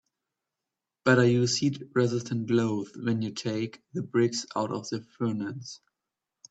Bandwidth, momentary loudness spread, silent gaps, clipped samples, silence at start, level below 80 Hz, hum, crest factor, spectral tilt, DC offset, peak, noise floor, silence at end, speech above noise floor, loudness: 8.4 kHz; 14 LU; none; under 0.1%; 1.05 s; -70 dBFS; none; 22 dB; -5.5 dB/octave; under 0.1%; -8 dBFS; -88 dBFS; 0.75 s; 61 dB; -28 LUFS